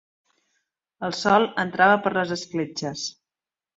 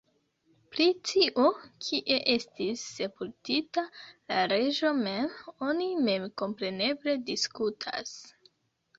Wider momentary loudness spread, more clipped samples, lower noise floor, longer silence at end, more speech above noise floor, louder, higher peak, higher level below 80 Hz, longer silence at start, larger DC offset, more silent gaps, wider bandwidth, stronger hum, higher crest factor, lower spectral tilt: about the same, 13 LU vs 11 LU; neither; first, under -90 dBFS vs -70 dBFS; about the same, 0.65 s vs 0.7 s; first, over 68 dB vs 41 dB; first, -23 LUFS vs -29 LUFS; first, -4 dBFS vs -10 dBFS; first, -66 dBFS vs -72 dBFS; first, 1 s vs 0.7 s; neither; neither; about the same, 8 kHz vs 8 kHz; neither; about the same, 20 dB vs 20 dB; about the same, -4 dB/octave vs -3.5 dB/octave